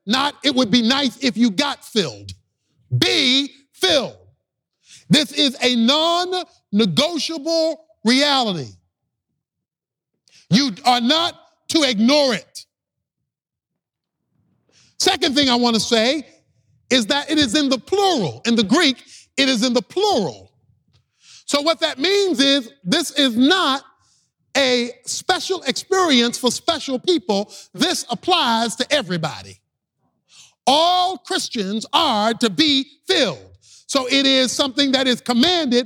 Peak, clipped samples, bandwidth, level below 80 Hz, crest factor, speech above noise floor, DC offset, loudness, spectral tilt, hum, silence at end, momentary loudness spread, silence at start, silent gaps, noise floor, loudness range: -2 dBFS; under 0.1%; 17.5 kHz; -60 dBFS; 18 dB; 68 dB; under 0.1%; -18 LUFS; -3.5 dB/octave; none; 0 s; 9 LU; 0.05 s; none; -87 dBFS; 4 LU